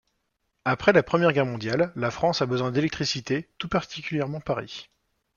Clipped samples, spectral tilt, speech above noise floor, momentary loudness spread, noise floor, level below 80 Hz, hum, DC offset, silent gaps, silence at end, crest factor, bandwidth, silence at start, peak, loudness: under 0.1%; -5.5 dB/octave; 51 dB; 10 LU; -76 dBFS; -56 dBFS; none; under 0.1%; none; 0.55 s; 24 dB; 7.2 kHz; 0.65 s; -2 dBFS; -25 LUFS